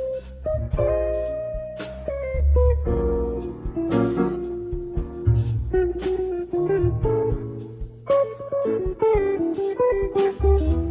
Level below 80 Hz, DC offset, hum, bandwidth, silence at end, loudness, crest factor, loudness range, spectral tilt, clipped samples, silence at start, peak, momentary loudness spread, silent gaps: -28 dBFS; under 0.1%; none; 4 kHz; 0 s; -24 LUFS; 14 dB; 2 LU; -12.5 dB/octave; under 0.1%; 0 s; -8 dBFS; 10 LU; none